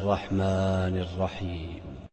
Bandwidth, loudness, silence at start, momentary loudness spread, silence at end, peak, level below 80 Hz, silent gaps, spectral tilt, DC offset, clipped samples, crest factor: 8.6 kHz; -29 LUFS; 0 s; 12 LU; 0.05 s; -12 dBFS; -46 dBFS; none; -7.5 dB/octave; under 0.1%; under 0.1%; 16 dB